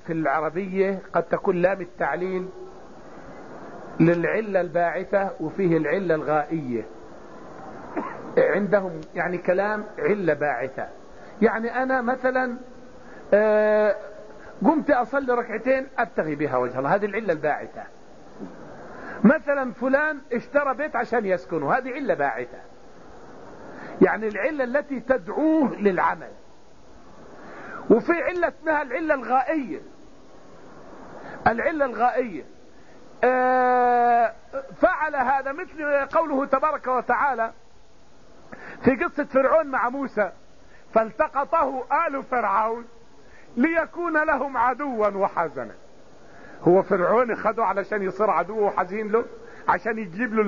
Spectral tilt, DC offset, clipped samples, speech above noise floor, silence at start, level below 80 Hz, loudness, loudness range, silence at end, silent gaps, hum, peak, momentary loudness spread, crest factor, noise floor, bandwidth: -6 dB/octave; 0.5%; under 0.1%; 32 dB; 0.05 s; -58 dBFS; -23 LUFS; 4 LU; 0 s; none; none; -4 dBFS; 19 LU; 20 dB; -55 dBFS; 7.2 kHz